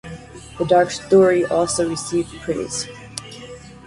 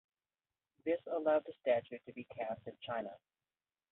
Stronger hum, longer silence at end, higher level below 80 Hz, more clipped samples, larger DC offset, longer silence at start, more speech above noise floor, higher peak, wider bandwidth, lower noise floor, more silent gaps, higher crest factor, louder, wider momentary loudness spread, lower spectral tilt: neither; second, 0.1 s vs 0.75 s; first, -48 dBFS vs -82 dBFS; neither; neither; second, 0.05 s vs 0.85 s; second, 20 dB vs over 52 dB; first, -4 dBFS vs -22 dBFS; first, 11.5 kHz vs 4 kHz; second, -38 dBFS vs under -90 dBFS; neither; about the same, 16 dB vs 18 dB; first, -19 LUFS vs -38 LUFS; first, 22 LU vs 15 LU; about the same, -4.5 dB/octave vs -3.5 dB/octave